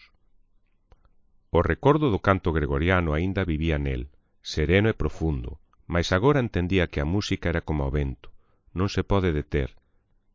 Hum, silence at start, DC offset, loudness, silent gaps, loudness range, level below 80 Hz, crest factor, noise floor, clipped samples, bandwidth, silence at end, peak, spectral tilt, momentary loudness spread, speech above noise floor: none; 1.55 s; under 0.1%; -25 LUFS; none; 2 LU; -34 dBFS; 20 dB; -65 dBFS; under 0.1%; 7.6 kHz; 0.65 s; -6 dBFS; -7 dB/octave; 12 LU; 41 dB